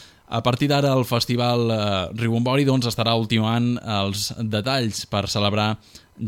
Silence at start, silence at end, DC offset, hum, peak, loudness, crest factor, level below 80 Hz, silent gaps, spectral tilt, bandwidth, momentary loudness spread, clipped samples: 0 s; 0 s; under 0.1%; none; -4 dBFS; -22 LUFS; 18 dB; -54 dBFS; none; -5.5 dB/octave; 16.5 kHz; 5 LU; under 0.1%